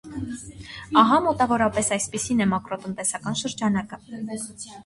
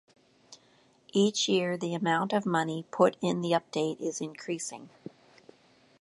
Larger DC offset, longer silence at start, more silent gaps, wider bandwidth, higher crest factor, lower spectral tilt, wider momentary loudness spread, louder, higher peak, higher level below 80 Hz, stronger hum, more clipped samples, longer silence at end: neither; second, 0.05 s vs 0.5 s; neither; about the same, 11.5 kHz vs 11.5 kHz; about the same, 22 dB vs 22 dB; about the same, -4 dB/octave vs -4.5 dB/octave; first, 16 LU vs 13 LU; first, -23 LUFS vs -29 LUFS; first, -4 dBFS vs -8 dBFS; first, -52 dBFS vs -78 dBFS; neither; neither; second, 0.05 s vs 1.15 s